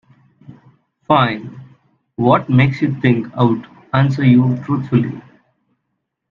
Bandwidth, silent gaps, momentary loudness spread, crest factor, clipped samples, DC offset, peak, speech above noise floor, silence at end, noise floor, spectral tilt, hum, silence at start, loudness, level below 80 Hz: 5.2 kHz; none; 13 LU; 18 dB; under 0.1%; under 0.1%; 0 dBFS; 59 dB; 1.1 s; -74 dBFS; -9 dB/octave; none; 0.5 s; -16 LUFS; -52 dBFS